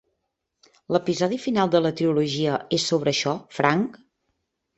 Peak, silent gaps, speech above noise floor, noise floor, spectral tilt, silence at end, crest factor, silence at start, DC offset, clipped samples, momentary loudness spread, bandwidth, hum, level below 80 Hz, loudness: -2 dBFS; none; 56 dB; -78 dBFS; -5 dB/octave; 0.8 s; 22 dB; 0.9 s; under 0.1%; under 0.1%; 5 LU; 8.2 kHz; none; -64 dBFS; -23 LUFS